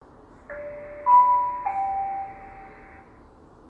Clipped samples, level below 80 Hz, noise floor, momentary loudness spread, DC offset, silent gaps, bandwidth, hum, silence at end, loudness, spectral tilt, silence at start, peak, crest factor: under 0.1%; -56 dBFS; -51 dBFS; 25 LU; under 0.1%; none; 3 kHz; none; 0.95 s; -22 LUFS; -7 dB/octave; 0.5 s; -8 dBFS; 18 dB